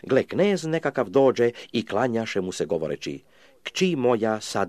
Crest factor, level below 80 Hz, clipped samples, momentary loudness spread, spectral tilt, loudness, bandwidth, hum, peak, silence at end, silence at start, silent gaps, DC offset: 16 dB; -64 dBFS; under 0.1%; 11 LU; -5.5 dB/octave; -24 LUFS; 13.5 kHz; none; -8 dBFS; 0 s; 0.05 s; none; 0.1%